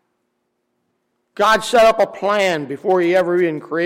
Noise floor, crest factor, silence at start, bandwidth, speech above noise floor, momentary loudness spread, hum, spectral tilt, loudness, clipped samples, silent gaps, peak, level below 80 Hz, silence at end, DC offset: -71 dBFS; 14 dB; 1.4 s; 16.5 kHz; 55 dB; 6 LU; none; -4.5 dB/octave; -16 LUFS; under 0.1%; none; -4 dBFS; -52 dBFS; 0 s; under 0.1%